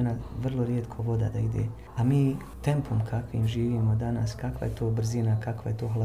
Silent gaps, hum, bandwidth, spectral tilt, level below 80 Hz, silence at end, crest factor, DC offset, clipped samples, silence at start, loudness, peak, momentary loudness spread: none; none; 11.5 kHz; -8 dB/octave; -44 dBFS; 0 s; 14 dB; 0.2%; under 0.1%; 0 s; -29 LUFS; -12 dBFS; 6 LU